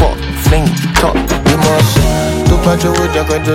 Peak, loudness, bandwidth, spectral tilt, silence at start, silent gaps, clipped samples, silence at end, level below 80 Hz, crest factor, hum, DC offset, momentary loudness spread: 0 dBFS; -11 LUFS; 17 kHz; -5.5 dB/octave; 0 s; none; under 0.1%; 0 s; -18 dBFS; 10 dB; none; under 0.1%; 3 LU